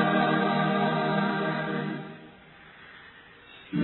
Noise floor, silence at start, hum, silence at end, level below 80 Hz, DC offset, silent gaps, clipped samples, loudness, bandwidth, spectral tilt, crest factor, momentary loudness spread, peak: -51 dBFS; 0 s; none; 0 s; -70 dBFS; under 0.1%; none; under 0.1%; -27 LUFS; 4.2 kHz; -10 dB/octave; 16 dB; 24 LU; -12 dBFS